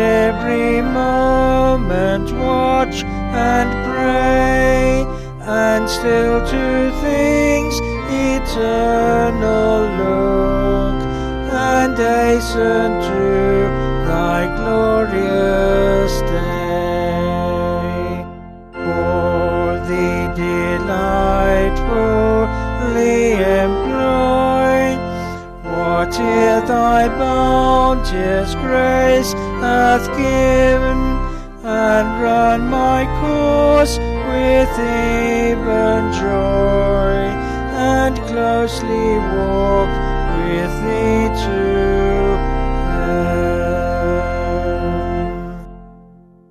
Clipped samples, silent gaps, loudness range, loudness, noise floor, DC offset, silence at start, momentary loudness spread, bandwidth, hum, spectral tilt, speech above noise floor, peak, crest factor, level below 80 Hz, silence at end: under 0.1%; none; 3 LU; -16 LUFS; -44 dBFS; under 0.1%; 0 s; 7 LU; 14 kHz; none; -6 dB/octave; 30 dB; -2 dBFS; 14 dB; -24 dBFS; 0.55 s